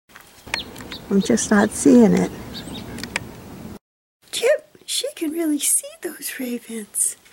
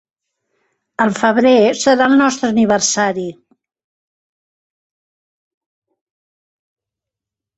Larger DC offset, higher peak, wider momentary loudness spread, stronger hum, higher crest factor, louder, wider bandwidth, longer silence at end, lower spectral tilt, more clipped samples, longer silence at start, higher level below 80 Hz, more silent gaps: neither; about the same, -2 dBFS vs 0 dBFS; first, 19 LU vs 10 LU; neither; about the same, 20 dB vs 18 dB; second, -20 LUFS vs -13 LUFS; first, 17 kHz vs 8.2 kHz; second, 0.2 s vs 4.25 s; about the same, -4 dB/octave vs -3.5 dB/octave; neither; second, 0.15 s vs 1 s; first, -50 dBFS vs -60 dBFS; first, 3.81-4.20 s vs none